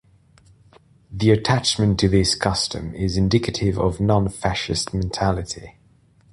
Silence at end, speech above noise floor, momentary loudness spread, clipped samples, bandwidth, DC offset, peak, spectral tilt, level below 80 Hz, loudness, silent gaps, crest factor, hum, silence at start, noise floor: 0.65 s; 35 dB; 8 LU; under 0.1%; 11.5 kHz; under 0.1%; -2 dBFS; -5 dB/octave; -36 dBFS; -21 LUFS; none; 20 dB; none; 1.1 s; -56 dBFS